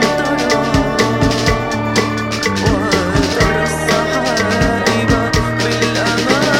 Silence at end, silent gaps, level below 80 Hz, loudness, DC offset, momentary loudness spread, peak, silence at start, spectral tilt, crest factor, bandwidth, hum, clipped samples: 0 s; none; -28 dBFS; -14 LUFS; under 0.1%; 2 LU; 0 dBFS; 0 s; -4.5 dB/octave; 14 dB; 17 kHz; none; under 0.1%